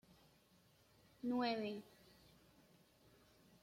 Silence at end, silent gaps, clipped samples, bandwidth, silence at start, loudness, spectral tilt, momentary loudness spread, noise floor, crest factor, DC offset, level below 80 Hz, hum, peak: 1.8 s; none; under 0.1%; 16.5 kHz; 1.25 s; -43 LUFS; -5.5 dB/octave; 26 LU; -72 dBFS; 20 dB; under 0.1%; -82 dBFS; none; -30 dBFS